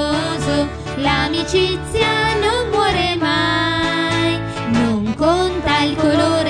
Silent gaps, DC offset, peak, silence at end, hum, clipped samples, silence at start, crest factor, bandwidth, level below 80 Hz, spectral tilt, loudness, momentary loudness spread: none; under 0.1%; -2 dBFS; 0 s; none; under 0.1%; 0 s; 16 dB; 10 kHz; -34 dBFS; -5 dB/octave; -17 LUFS; 4 LU